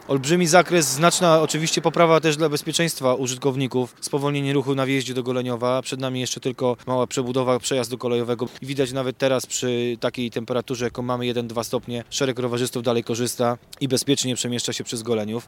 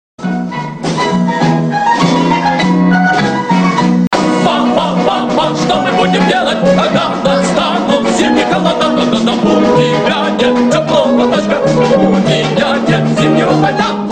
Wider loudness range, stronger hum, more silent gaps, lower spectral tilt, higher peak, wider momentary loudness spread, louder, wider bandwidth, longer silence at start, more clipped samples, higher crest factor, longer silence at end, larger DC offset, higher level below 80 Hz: first, 6 LU vs 1 LU; neither; second, none vs 4.07-4.11 s; second, -4 dB/octave vs -5.5 dB/octave; about the same, 0 dBFS vs 0 dBFS; first, 9 LU vs 3 LU; second, -22 LUFS vs -11 LUFS; first, 18 kHz vs 9.6 kHz; second, 0 s vs 0.2 s; neither; first, 22 dB vs 10 dB; about the same, 0.05 s vs 0 s; neither; second, -60 dBFS vs -42 dBFS